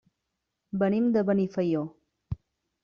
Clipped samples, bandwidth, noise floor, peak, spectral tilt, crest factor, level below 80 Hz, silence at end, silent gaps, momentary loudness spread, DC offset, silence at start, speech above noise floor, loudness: under 0.1%; 6.6 kHz; -83 dBFS; -14 dBFS; -8.5 dB/octave; 16 dB; -58 dBFS; 0.5 s; none; 16 LU; under 0.1%; 0.75 s; 57 dB; -27 LUFS